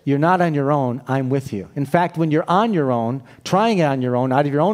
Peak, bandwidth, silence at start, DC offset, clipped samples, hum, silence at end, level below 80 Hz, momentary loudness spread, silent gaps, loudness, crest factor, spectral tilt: -2 dBFS; 15 kHz; 0.05 s; under 0.1%; under 0.1%; none; 0 s; -62 dBFS; 7 LU; none; -19 LUFS; 16 dB; -7.5 dB/octave